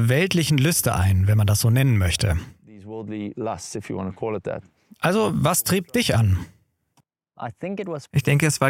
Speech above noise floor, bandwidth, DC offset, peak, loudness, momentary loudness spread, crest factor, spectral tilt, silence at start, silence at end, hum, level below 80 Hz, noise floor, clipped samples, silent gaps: 45 dB; 16.5 kHz; under 0.1%; -2 dBFS; -22 LUFS; 14 LU; 18 dB; -5 dB/octave; 0 s; 0 s; none; -42 dBFS; -66 dBFS; under 0.1%; none